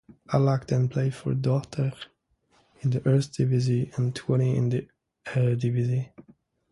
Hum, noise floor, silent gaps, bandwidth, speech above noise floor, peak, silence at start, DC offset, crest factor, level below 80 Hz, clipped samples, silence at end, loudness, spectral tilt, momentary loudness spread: none; -66 dBFS; none; 11 kHz; 42 dB; -8 dBFS; 0.3 s; under 0.1%; 18 dB; -58 dBFS; under 0.1%; 0.5 s; -26 LUFS; -8 dB/octave; 8 LU